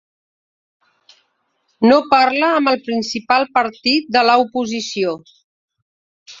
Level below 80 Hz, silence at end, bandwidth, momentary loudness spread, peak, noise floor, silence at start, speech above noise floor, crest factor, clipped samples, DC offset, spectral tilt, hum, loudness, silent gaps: -62 dBFS; 0.05 s; 7.8 kHz; 9 LU; 0 dBFS; -67 dBFS; 1.8 s; 51 dB; 18 dB; under 0.1%; under 0.1%; -3.5 dB/octave; none; -16 LUFS; 5.44-5.68 s, 5.82-6.26 s